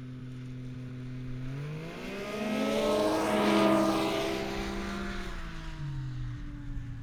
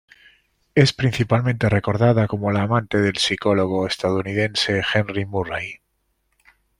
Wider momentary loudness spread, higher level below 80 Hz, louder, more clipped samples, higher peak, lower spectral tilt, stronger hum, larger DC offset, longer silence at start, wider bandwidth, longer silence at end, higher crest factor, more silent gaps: first, 16 LU vs 7 LU; first, -44 dBFS vs -50 dBFS; second, -32 LUFS vs -20 LUFS; neither; second, -12 dBFS vs -2 dBFS; about the same, -5.5 dB/octave vs -5.5 dB/octave; neither; neither; second, 0 s vs 0.75 s; first, 19 kHz vs 12 kHz; second, 0 s vs 1.05 s; about the same, 20 dB vs 18 dB; neither